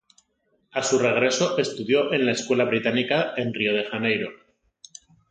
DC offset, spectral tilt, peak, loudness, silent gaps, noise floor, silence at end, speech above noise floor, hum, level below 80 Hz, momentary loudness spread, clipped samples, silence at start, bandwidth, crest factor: under 0.1%; -4 dB/octave; -8 dBFS; -23 LUFS; none; -69 dBFS; 0.95 s; 47 dB; none; -68 dBFS; 6 LU; under 0.1%; 0.75 s; 9.4 kHz; 18 dB